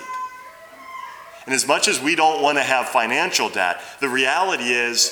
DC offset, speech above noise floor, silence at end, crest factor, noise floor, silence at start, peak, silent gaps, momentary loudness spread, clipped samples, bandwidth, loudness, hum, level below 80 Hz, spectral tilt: under 0.1%; 21 dB; 0 s; 20 dB; -41 dBFS; 0 s; -2 dBFS; none; 18 LU; under 0.1%; over 20 kHz; -19 LUFS; none; -70 dBFS; -1 dB/octave